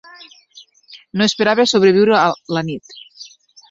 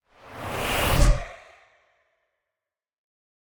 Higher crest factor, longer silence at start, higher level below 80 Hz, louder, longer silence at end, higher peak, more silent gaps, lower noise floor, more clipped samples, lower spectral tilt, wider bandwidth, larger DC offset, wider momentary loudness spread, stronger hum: second, 16 dB vs 22 dB; first, 0.9 s vs 0.25 s; second, -60 dBFS vs -30 dBFS; first, -15 LUFS vs -24 LUFS; second, 0.45 s vs 2.15 s; first, -2 dBFS vs -6 dBFS; neither; second, -47 dBFS vs -89 dBFS; neither; about the same, -4.5 dB/octave vs -4 dB/octave; second, 8 kHz vs over 20 kHz; neither; second, 18 LU vs 22 LU; neither